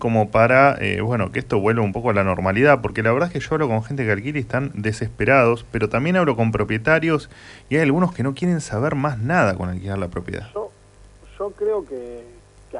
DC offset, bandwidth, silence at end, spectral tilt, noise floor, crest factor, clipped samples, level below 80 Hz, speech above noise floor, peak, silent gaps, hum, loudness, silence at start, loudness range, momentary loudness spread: under 0.1%; 11 kHz; 0 s; -7 dB/octave; -47 dBFS; 18 dB; under 0.1%; -44 dBFS; 27 dB; -2 dBFS; none; 50 Hz at -50 dBFS; -20 LUFS; 0 s; 6 LU; 14 LU